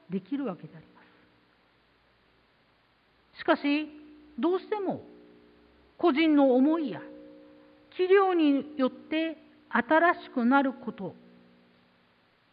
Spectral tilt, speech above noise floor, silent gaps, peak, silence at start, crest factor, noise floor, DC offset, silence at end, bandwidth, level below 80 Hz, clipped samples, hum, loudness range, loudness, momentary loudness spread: -9 dB/octave; 40 dB; none; -10 dBFS; 0.1 s; 20 dB; -66 dBFS; under 0.1%; 1.4 s; 5.2 kHz; -74 dBFS; under 0.1%; none; 9 LU; -27 LUFS; 19 LU